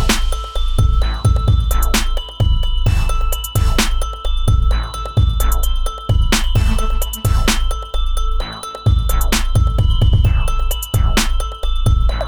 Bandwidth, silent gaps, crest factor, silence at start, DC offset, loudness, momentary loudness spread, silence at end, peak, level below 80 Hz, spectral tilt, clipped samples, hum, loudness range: over 20 kHz; none; 10 dB; 0 s; under 0.1%; -18 LUFS; 7 LU; 0 s; -4 dBFS; -16 dBFS; -4.5 dB/octave; under 0.1%; none; 2 LU